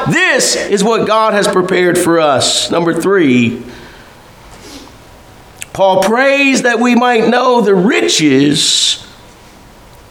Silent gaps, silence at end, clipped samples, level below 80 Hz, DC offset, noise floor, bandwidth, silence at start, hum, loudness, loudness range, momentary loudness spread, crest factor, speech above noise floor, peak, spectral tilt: none; 1.05 s; under 0.1%; -48 dBFS; under 0.1%; -38 dBFS; 19 kHz; 0 s; none; -10 LUFS; 6 LU; 4 LU; 12 dB; 28 dB; 0 dBFS; -3.5 dB/octave